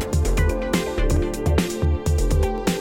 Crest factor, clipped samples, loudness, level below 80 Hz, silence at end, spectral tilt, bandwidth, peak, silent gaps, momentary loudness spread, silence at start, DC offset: 12 dB; under 0.1%; -22 LUFS; -24 dBFS; 0 s; -6 dB/octave; 17 kHz; -8 dBFS; none; 2 LU; 0 s; under 0.1%